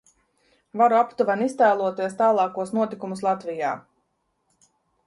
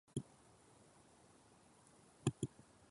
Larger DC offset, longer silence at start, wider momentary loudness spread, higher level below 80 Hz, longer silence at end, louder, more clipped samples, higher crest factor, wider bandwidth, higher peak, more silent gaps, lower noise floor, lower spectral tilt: neither; first, 0.75 s vs 0.15 s; second, 9 LU vs 23 LU; about the same, -72 dBFS vs -72 dBFS; first, 1.25 s vs 0.45 s; first, -23 LUFS vs -46 LUFS; neither; second, 16 dB vs 28 dB; about the same, 11.5 kHz vs 11.5 kHz; first, -8 dBFS vs -22 dBFS; neither; first, -73 dBFS vs -68 dBFS; about the same, -6 dB/octave vs -6 dB/octave